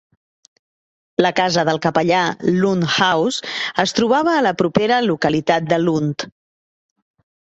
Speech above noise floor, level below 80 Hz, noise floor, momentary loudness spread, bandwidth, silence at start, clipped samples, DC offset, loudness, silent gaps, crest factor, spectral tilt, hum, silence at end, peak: over 73 dB; -56 dBFS; under -90 dBFS; 6 LU; 8.2 kHz; 1.2 s; under 0.1%; under 0.1%; -17 LUFS; none; 18 dB; -5 dB/octave; none; 1.3 s; -2 dBFS